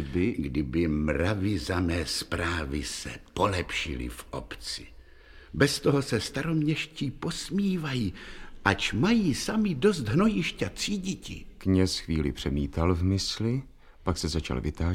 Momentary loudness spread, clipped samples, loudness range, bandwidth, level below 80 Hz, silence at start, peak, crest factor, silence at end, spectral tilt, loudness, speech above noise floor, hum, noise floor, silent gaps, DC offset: 11 LU; under 0.1%; 4 LU; 16.5 kHz; -42 dBFS; 0 s; -6 dBFS; 24 dB; 0 s; -5.5 dB/octave; -28 LUFS; 23 dB; none; -50 dBFS; none; under 0.1%